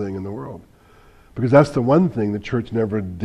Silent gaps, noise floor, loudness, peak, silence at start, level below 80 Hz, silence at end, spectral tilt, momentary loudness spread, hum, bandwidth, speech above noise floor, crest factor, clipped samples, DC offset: none; -49 dBFS; -19 LUFS; 0 dBFS; 0 s; -48 dBFS; 0 s; -8.5 dB/octave; 17 LU; none; 11.5 kHz; 30 dB; 20 dB; under 0.1%; under 0.1%